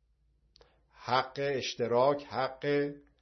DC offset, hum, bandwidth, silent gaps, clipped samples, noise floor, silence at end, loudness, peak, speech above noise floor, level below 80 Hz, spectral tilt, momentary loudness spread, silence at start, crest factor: under 0.1%; none; 6.4 kHz; none; under 0.1%; -70 dBFS; 0.2 s; -31 LUFS; -12 dBFS; 40 dB; -68 dBFS; -5 dB/octave; 7 LU; 1 s; 20 dB